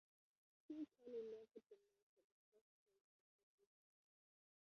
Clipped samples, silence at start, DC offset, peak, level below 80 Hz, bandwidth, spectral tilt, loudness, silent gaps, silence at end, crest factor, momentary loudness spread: under 0.1%; 0.7 s; under 0.1%; -44 dBFS; under -90 dBFS; 6.4 kHz; -6 dB/octave; -56 LUFS; 2.03-2.17 s, 2.24-2.52 s; 2.1 s; 18 dB; 12 LU